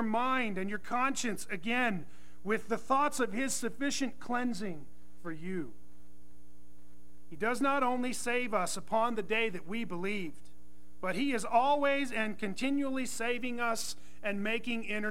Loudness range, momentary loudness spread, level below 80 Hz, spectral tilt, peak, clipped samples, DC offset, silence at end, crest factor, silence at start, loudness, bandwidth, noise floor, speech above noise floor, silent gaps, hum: 6 LU; 10 LU; -64 dBFS; -3.5 dB/octave; -14 dBFS; under 0.1%; 1%; 0 s; 18 dB; 0 s; -33 LUFS; 16 kHz; -61 dBFS; 28 dB; none; none